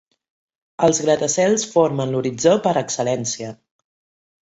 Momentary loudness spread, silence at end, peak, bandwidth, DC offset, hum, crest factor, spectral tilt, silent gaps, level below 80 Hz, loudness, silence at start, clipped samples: 7 LU; 0.95 s; -2 dBFS; 8.2 kHz; under 0.1%; none; 18 dB; -4 dB/octave; none; -60 dBFS; -19 LUFS; 0.8 s; under 0.1%